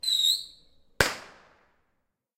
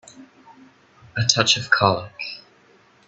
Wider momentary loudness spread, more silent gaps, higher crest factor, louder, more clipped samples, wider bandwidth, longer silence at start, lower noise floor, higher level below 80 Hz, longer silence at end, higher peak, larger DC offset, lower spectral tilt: first, 19 LU vs 16 LU; neither; about the same, 26 dB vs 24 dB; second, -25 LUFS vs -19 LUFS; neither; first, 16 kHz vs 8.4 kHz; about the same, 0.05 s vs 0.15 s; first, -77 dBFS vs -55 dBFS; first, -52 dBFS vs -58 dBFS; first, 1.1 s vs 0.7 s; second, -4 dBFS vs 0 dBFS; neither; second, -1 dB/octave vs -2.5 dB/octave